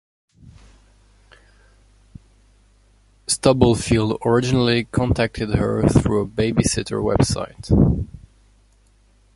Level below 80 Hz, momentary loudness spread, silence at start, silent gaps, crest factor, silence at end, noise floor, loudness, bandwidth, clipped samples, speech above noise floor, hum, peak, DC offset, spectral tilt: -34 dBFS; 5 LU; 0.45 s; none; 20 dB; 1.2 s; -56 dBFS; -19 LUFS; 11.5 kHz; under 0.1%; 38 dB; 50 Hz at -45 dBFS; 0 dBFS; under 0.1%; -5.5 dB/octave